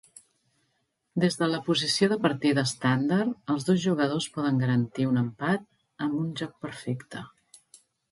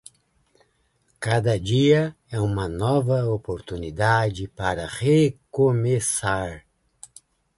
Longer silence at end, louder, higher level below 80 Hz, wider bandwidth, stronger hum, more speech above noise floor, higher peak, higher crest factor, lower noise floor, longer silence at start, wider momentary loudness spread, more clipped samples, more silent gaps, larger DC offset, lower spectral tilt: second, 0.85 s vs 1 s; second, -27 LUFS vs -23 LUFS; second, -68 dBFS vs -46 dBFS; about the same, 11.5 kHz vs 11.5 kHz; neither; first, 49 dB vs 45 dB; second, -10 dBFS vs -6 dBFS; about the same, 18 dB vs 18 dB; first, -75 dBFS vs -67 dBFS; about the same, 1.15 s vs 1.2 s; about the same, 11 LU vs 11 LU; neither; neither; neither; about the same, -5.5 dB/octave vs -5.5 dB/octave